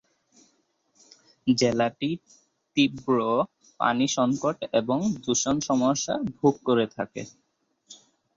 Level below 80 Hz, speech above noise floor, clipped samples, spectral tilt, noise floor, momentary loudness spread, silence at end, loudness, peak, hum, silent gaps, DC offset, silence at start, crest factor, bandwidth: -62 dBFS; 45 dB; under 0.1%; -4.5 dB/octave; -69 dBFS; 9 LU; 0.4 s; -25 LUFS; -8 dBFS; none; none; under 0.1%; 1.45 s; 20 dB; 7.8 kHz